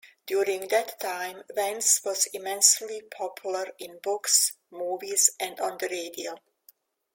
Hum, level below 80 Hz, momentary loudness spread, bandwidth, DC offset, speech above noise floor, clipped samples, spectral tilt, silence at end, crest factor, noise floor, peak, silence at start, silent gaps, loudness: none; -80 dBFS; 15 LU; 17 kHz; under 0.1%; 33 dB; under 0.1%; 1 dB/octave; 0.75 s; 24 dB; -61 dBFS; -4 dBFS; 0.05 s; none; -25 LUFS